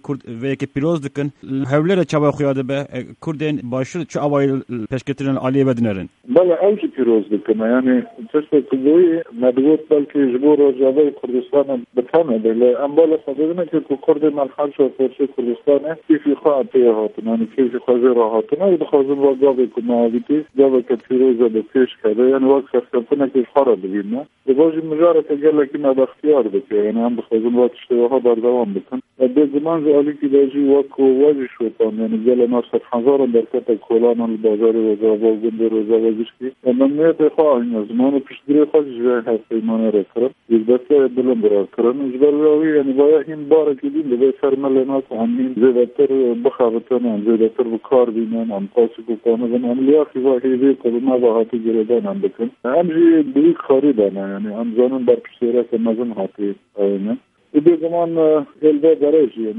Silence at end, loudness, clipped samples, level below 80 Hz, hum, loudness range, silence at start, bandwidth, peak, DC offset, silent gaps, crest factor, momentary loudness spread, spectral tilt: 0 s; -17 LUFS; under 0.1%; -64 dBFS; none; 3 LU; 0.05 s; 7.6 kHz; 0 dBFS; under 0.1%; none; 16 dB; 7 LU; -8.5 dB/octave